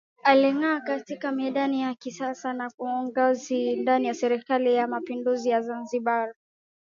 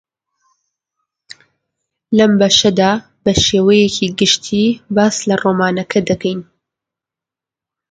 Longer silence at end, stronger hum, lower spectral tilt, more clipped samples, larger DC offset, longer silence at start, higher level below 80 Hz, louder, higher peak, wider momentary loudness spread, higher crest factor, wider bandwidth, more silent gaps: second, 0.5 s vs 1.5 s; neither; about the same, -4 dB/octave vs -4 dB/octave; neither; neither; second, 0.25 s vs 2.1 s; second, -80 dBFS vs -42 dBFS; second, -26 LUFS vs -13 LUFS; second, -4 dBFS vs 0 dBFS; first, 10 LU vs 7 LU; first, 22 dB vs 16 dB; second, 7.4 kHz vs 9.2 kHz; first, 2.74-2.78 s vs none